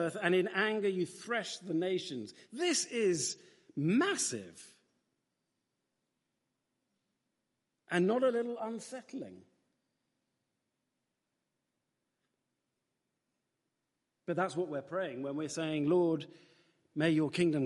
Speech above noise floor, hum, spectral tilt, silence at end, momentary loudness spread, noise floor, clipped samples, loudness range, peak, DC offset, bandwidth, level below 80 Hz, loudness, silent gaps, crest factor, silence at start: 52 dB; none; -4.5 dB/octave; 0 s; 15 LU; -86 dBFS; under 0.1%; 11 LU; -16 dBFS; under 0.1%; 11.5 kHz; -82 dBFS; -33 LUFS; none; 22 dB; 0 s